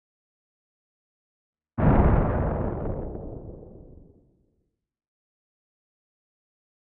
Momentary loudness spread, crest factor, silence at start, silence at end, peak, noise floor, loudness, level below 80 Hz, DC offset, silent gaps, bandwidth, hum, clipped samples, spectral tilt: 21 LU; 20 dB; 1.75 s; 3.2 s; -8 dBFS; -75 dBFS; -25 LUFS; -34 dBFS; under 0.1%; none; 3.7 kHz; none; under 0.1%; -13 dB/octave